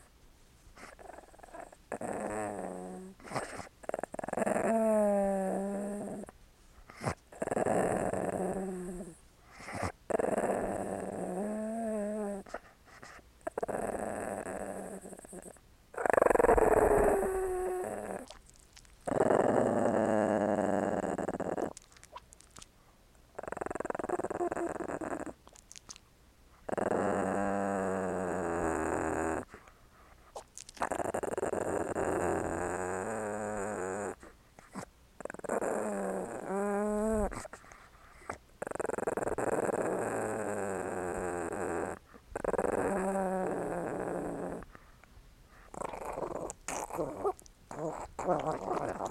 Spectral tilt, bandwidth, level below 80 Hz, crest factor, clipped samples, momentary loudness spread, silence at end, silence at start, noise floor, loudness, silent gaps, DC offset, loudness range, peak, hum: -6 dB/octave; 16 kHz; -54 dBFS; 24 dB; under 0.1%; 20 LU; 0 s; 0.25 s; -62 dBFS; -34 LUFS; none; under 0.1%; 10 LU; -10 dBFS; none